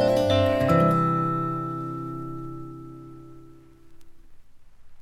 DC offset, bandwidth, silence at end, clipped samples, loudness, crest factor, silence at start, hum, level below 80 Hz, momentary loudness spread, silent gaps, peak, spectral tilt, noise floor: under 0.1%; 14.5 kHz; 0 s; under 0.1%; -24 LUFS; 18 dB; 0 s; none; -50 dBFS; 23 LU; none; -8 dBFS; -7.5 dB/octave; -48 dBFS